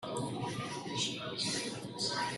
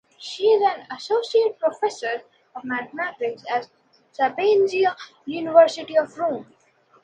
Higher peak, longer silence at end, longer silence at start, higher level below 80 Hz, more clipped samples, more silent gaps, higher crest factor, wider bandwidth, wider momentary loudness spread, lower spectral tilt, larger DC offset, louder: second, -20 dBFS vs -2 dBFS; second, 0 s vs 0.6 s; second, 0 s vs 0.2 s; first, -70 dBFS vs -76 dBFS; neither; neither; about the same, 18 dB vs 20 dB; first, 12.5 kHz vs 9.4 kHz; second, 4 LU vs 14 LU; about the same, -3 dB/octave vs -3.5 dB/octave; neither; second, -36 LUFS vs -22 LUFS